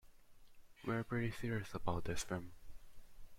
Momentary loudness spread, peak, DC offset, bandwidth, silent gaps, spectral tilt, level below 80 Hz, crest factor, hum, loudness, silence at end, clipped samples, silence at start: 7 LU; -24 dBFS; under 0.1%; 16.5 kHz; none; -5.5 dB/octave; -56 dBFS; 18 dB; none; -42 LUFS; 0 s; under 0.1%; 0.05 s